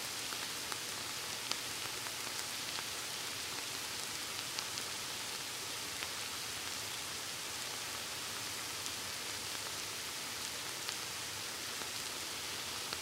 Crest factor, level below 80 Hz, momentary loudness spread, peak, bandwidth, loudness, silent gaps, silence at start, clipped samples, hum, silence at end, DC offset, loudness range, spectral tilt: 30 dB; -70 dBFS; 1 LU; -12 dBFS; 16 kHz; -39 LUFS; none; 0 s; under 0.1%; none; 0 s; under 0.1%; 1 LU; -0.5 dB/octave